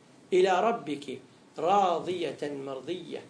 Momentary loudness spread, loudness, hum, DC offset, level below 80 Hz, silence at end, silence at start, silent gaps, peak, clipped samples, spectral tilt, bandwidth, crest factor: 14 LU; -29 LUFS; none; under 0.1%; -78 dBFS; 0 s; 0.3 s; none; -14 dBFS; under 0.1%; -5 dB/octave; 10.5 kHz; 16 dB